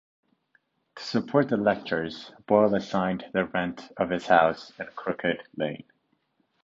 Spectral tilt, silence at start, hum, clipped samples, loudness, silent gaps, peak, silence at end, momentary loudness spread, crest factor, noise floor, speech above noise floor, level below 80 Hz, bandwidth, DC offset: -6.5 dB/octave; 0.95 s; none; under 0.1%; -26 LUFS; none; -6 dBFS; 0.9 s; 14 LU; 22 dB; -72 dBFS; 46 dB; -62 dBFS; 7.8 kHz; under 0.1%